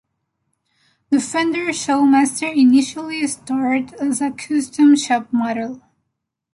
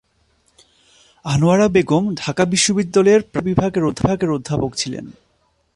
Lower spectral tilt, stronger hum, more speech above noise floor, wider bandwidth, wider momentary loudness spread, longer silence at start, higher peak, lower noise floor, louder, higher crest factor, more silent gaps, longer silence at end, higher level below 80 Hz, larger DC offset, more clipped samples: second, -3 dB/octave vs -5 dB/octave; neither; first, 60 dB vs 46 dB; about the same, 11.5 kHz vs 11.5 kHz; about the same, 10 LU vs 9 LU; second, 1.1 s vs 1.25 s; about the same, -4 dBFS vs -2 dBFS; first, -77 dBFS vs -63 dBFS; about the same, -18 LUFS vs -17 LUFS; about the same, 14 dB vs 16 dB; neither; about the same, 0.75 s vs 0.65 s; second, -62 dBFS vs -44 dBFS; neither; neither